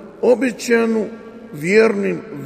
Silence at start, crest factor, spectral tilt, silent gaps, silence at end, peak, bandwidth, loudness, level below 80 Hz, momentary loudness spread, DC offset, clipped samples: 0 s; 16 dB; -5.5 dB/octave; none; 0 s; -2 dBFS; 15 kHz; -17 LUFS; -60 dBFS; 15 LU; under 0.1%; under 0.1%